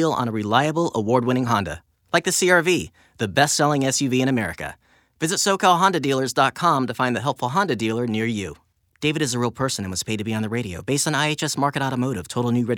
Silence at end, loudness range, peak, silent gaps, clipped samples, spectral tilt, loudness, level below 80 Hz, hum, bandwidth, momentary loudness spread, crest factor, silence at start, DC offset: 0 s; 4 LU; -2 dBFS; none; under 0.1%; -4 dB/octave; -21 LUFS; -58 dBFS; none; 18.5 kHz; 8 LU; 20 dB; 0 s; under 0.1%